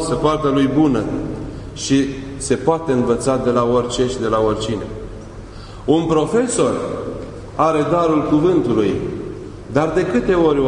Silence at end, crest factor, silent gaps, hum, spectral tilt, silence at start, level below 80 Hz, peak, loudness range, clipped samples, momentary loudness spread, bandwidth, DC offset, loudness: 0 s; 16 dB; none; none; -6 dB/octave; 0 s; -38 dBFS; -2 dBFS; 2 LU; under 0.1%; 15 LU; 11 kHz; under 0.1%; -18 LUFS